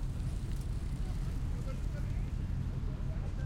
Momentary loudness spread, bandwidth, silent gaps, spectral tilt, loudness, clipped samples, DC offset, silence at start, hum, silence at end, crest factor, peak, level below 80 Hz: 1 LU; 12 kHz; none; -7.5 dB/octave; -39 LUFS; under 0.1%; under 0.1%; 0 s; none; 0 s; 12 dB; -24 dBFS; -38 dBFS